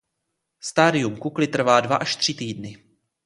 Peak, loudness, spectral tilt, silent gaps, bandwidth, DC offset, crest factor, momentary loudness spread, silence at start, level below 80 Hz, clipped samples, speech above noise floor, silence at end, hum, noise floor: -2 dBFS; -21 LUFS; -4 dB/octave; none; 11.5 kHz; under 0.1%; 22 dB; 15 LU; 0.65 s; -62 dBFS; under 0.1%; 57 dB; 0.5 s; none; -78 dBFS